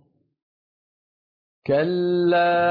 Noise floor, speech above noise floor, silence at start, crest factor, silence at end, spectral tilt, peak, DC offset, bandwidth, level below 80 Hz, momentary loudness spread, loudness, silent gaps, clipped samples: under -90 dBFS; over 71 dB; 1.65 s; 14 dB; 0 s; -9 dB/octave; -10 dBFS; under 0.1%; 5.2 kHz; -66 dBFS; 6 LU; -20 LUFS; none; under 0.1%